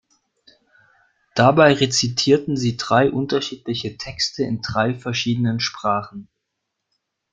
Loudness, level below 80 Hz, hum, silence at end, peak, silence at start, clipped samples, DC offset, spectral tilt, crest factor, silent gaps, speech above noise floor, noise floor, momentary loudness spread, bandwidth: -19 LUFS; -54 dBFS; none; 1.1 s; -2 dBFS; 1.35 s; under 0.1%; under 0.1%; -4.5 dB/octave; 20 dB; none; 59 dB; -78 dBFS; 12 LU; 9.4 kHz